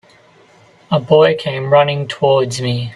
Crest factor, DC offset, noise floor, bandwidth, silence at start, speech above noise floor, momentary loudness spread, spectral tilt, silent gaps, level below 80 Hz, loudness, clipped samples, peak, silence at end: 14 dB; under 0.1%; -48 dBFS; 12 kHz; 0.9 s; 34 dB; 8 LU; -5.5 dB/octave; none; -54 dBFS; -14 LUFS; under 0.1%; 0 dBFS; 0 s